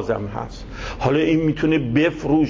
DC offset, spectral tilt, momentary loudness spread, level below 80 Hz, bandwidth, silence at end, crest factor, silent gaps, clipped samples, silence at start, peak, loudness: under 0.1%; -7.5 dB/octave; 14 LU; -38 dBFS; 7.4 kHz; 0 s; 14 dB; none; under 0.1%; 0 s; -6 dBFS; -20 LUFS